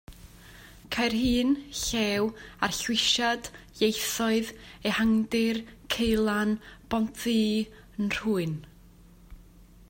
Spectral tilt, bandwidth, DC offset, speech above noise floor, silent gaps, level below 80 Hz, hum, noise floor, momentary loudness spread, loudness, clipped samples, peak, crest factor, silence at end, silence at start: -3.5 dB/octave; 16.5 kHz; under 0.1%; 26 dB; none; -50 dBFS; none; -53 dBFS; 9 LU; -27 LUFS; under 0.1%; -10 dBFS; 20 dB; 0.25 s; 0.1 s